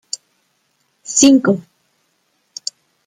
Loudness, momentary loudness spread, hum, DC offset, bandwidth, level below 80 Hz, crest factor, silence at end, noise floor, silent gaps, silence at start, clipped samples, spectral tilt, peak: -14 LUFS; 22 LU; none; under 0.1%; 12.5 kHz; -60 dBFS; 18 dB; 1.45 s; -65 dBFS; none; 1.1 s; under 0.1%; -3.5 dB/octave; 0 dBFS